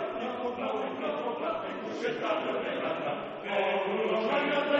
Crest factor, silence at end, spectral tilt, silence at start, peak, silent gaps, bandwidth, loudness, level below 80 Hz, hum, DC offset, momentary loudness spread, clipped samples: 16 dB; 0 s; -5.5 dB/octave; 0 s; -16 dBFS; none; 8 kHz; -31 LUFS; -72 dBFS; none; under 0.1%; 6 LU; under 0.1%